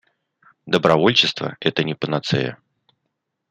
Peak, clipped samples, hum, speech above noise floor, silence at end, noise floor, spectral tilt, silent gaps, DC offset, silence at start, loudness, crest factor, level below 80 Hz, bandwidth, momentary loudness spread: -2 dBFS; under 0.1%; none; 57 dB; 0.95 s; -77 dBFS; -5 dB/octave; none; under 0.1%; 0.65 s; -19 LUFS; 20 dB; -60 dBFS; 9.8 kHz; 9 LU